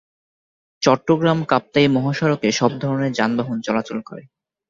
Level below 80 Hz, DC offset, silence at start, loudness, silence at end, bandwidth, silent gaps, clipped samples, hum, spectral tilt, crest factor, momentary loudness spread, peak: -58 dBFS; under 0.1%; 0.8 s; -19 LUFS; 0.5 s; 7.6 kHz; none; under 0.1%; none; -5.5 dB/octave; 18 dB; 9 LU; -2 dBFS